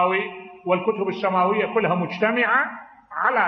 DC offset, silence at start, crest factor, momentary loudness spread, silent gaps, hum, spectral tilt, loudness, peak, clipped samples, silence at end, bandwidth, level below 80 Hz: under 0.1%; 0 s; 16 dB; 13 LU; none; none; -7.5 dB/octave; -22 LUFS; -6 dBFS; under 0.1%; 0 s; 6.2 kHz; -68 dBFS